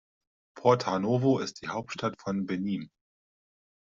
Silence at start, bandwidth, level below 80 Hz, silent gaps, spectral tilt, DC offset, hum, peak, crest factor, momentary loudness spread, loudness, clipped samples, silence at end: 0.55 s; 7.8 kHz; -70 dBFS; none; -6 dB/octave; under 0.1%; none; -8 dBFS; 22 dB; 10 LU; -29 LUFS; under 0.1%; 1.1 s